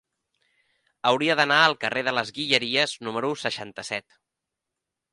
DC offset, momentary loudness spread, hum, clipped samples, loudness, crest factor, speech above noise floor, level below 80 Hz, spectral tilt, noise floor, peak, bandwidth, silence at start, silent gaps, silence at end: under 0.1%; 13 LU; none; under 0.1%; -23 LUFS; 24 dB; 61 dB; -70 dBFS; -3 dB/octave; -85 dBFS; -2 dBFS; 11.5 kHz; 1.05 s; none; 1.15 s